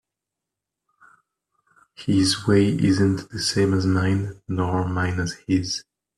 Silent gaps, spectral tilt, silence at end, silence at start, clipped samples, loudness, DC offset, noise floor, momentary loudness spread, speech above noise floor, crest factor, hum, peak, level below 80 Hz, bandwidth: none; -5.5 dB/octave; 0.35 s; 2 s; under 0.1%; -22 LUFS; under 0.1%; -85 dBFS; 9 LU; 64 dB; 18 dB; none; -6 dBFS; -54 dBFS; 12.5 kHz